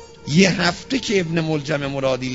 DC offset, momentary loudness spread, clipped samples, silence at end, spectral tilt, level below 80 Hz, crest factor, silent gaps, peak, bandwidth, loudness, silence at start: under 0.1%; 6 LU; under 0.1%; 0 s; -5 dB/octave; -48 dBFS; 18 dB; none; -2 dBFS; 8 kHz; -20 LUFS; 0 s